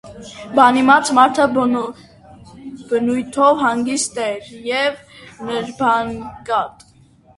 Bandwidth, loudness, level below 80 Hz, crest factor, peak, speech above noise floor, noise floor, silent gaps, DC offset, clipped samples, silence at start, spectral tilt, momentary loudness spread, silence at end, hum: 11.5 kHz; -17 LUFS; -54 dBFS; 18 dB; 0 dBFS; 33 dB; -50 dBFS; none; under 0.1%; under 0.1%; 0.05 s; -3.5 dB/octave; 20 LU; 0.65 s; none